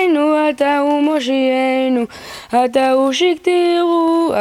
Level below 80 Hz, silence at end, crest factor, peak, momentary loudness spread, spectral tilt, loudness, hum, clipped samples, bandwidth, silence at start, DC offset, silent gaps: -58 dBFS; 0 s; 12 dB; -2 dBFS; 4 LU; -3.5 dB/octave; -15 LUFS; none; under 0.1%; 14.5 kHz; 0 s; under 0.1%; none